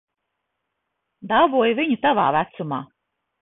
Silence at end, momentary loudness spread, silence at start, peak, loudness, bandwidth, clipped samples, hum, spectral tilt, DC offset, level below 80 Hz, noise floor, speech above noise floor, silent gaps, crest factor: 0.6 s; 11 LU; 1.25 s; -4 dBFS; -20 LUFS; 4 kHz; under 0.1%; none; -10 dB/octave; under 0.1%; -62 dBFS; -78 dBFS; 59 dB; none; 18 dB